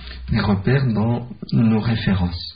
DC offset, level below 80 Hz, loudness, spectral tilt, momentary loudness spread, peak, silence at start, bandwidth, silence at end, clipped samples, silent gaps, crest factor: 0.4%; -36 dBFS; -20 LUFS; -6.5 dB/octave; 5 LU; -6 dBFS; 0 s; 5.2 kHz; 0 s; under 0.1%; none; 14 dB